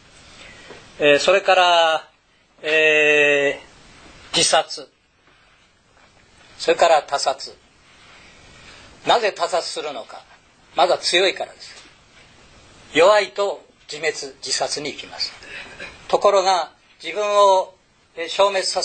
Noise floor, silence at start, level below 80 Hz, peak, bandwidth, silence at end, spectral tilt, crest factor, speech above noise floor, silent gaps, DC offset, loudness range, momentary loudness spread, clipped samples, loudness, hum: -58 dBFS; 0.4 s; -58 dBFS; -2 dBFS; 9.2 kHz; 0 s; -1.5 dB/octave; 18 dB; 39 dB; none; under 0.1%; 7 LU; 19 LU; under 0.1%; -18 LUFS; none